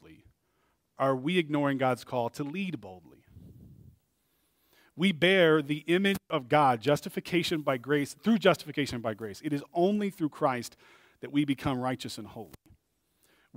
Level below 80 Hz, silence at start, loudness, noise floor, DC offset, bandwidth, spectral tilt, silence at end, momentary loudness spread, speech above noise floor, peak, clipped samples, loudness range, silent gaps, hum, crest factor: -64 dBFS; 0.1 s; -29 LUFS; -74 dBFS; under 0.1%; 16 kHz; -5.5 dB/octave; 1.1 s; 13 LU; 45 dB; -8 dBFS; under 0.1%; 8 LU; none; none; 24 dB